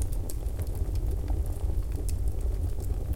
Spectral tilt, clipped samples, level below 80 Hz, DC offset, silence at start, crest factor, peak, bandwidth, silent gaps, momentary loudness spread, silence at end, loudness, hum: -7 dB/octave; under 0.1%; -30 dBFS; under 0.1%; 0 s; 14 dB; -14 dBFS; 17 kHz; none; 3 LU; 0 s; -33 LUFS; none